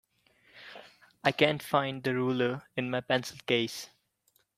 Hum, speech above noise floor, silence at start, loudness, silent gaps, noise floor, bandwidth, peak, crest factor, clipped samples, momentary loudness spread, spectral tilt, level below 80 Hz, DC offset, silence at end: none; 43 dB; 0.55 s; -30 LUFS; none; -72 dBFS; 16 kHz; -8 dBFS; 24 dB; under 0.1%; 22 LU; -5 dB/octave; -72 dBFS; under 0.1%; 0.7 s